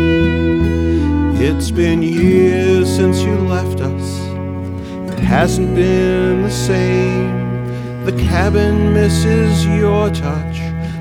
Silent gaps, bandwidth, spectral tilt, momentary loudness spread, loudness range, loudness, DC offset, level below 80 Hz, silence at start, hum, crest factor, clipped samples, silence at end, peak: none; 16 kHz; -6.5 dB/octave; 9 LU; 3 LU; -15 LUFS; under 0.1%; -26 dBFS; 0 s; none; 14 dB; under 0.1%; 0 s; 0 dBFS